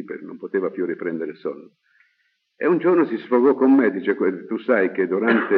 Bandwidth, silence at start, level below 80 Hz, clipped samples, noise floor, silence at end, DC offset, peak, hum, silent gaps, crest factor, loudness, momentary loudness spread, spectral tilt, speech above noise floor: 4.7 kHz; 0 s; under -90 dBFS; under 0.1%; -69 dBFS; 0 s; under 0.1%; -4 dBFS; none; none; 16 dB; -20 LUFS; 15 LU; -5.5 dB/octave; 49 dB